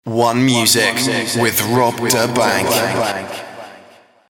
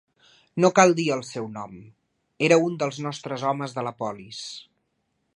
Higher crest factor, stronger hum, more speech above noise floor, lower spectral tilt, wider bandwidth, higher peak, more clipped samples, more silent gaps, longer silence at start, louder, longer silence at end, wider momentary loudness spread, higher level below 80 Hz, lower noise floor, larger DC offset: second, 16 dB vs 24 dB; neither; second, 30 dB vs 50 dB; second, -3.5 dB/octave vs -5 dB/octave; first, 18 kHz vs 11 kHz; about the same, -2 dBFS vs -2 dBFS; neither; neither; second, 0.05 s vs 0.55 s; first, -15 LUFS vs -23 LUFS; second, 0.5 s vs 0.75 s; second, 15 LU vs 18 LU; first, -54 dBFS vs -70 dBFS; second, -46 dBFS vs -74 dBFS; neither